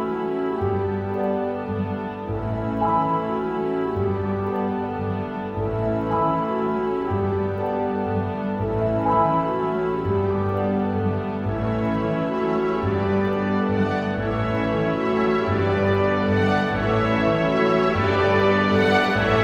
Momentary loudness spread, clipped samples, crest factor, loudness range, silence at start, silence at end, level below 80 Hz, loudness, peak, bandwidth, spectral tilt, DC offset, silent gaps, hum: 7 LU; under 0.1%; 16 dB; 4 LU; 0 s; 0 s; -44 dBFS; -22 LUFS; -6 dBFS; 8.6 kHz; -8 dB/octave; under 0.1%; none; none